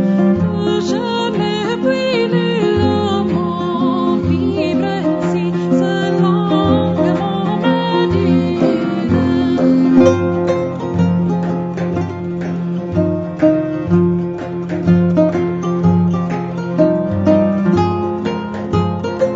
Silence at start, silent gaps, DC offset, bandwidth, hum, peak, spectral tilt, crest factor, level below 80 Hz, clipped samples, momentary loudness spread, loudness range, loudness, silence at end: 0 s; none; under 0.1%; 7.8 kHz; none; 0 dBFS; -8 dB/octave; 14 dB; -44 dBFS; under 0.1%; 6 LU; 3 LU; -16 LUFS; 0 s